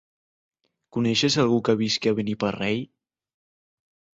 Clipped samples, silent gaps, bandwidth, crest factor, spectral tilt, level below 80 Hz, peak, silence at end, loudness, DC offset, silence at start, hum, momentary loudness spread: under 0.1%; none; 8 kHz; 20 dB; -5 dB/octave; -62 dBFS; -6 dBFS; 1.3 s; -23 LUFS; under 0.1%; 0.95 s; none; 9 LU